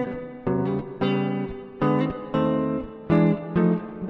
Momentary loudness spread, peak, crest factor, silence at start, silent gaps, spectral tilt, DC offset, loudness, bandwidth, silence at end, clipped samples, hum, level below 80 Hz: 10 LU; -8 dBFS; 16 dB; 0 s; none; -10 dB/octave; under 0.1%; -25 LUFS; 5.6 kHz; 0 s; under 0.1%; none; -50 dBFS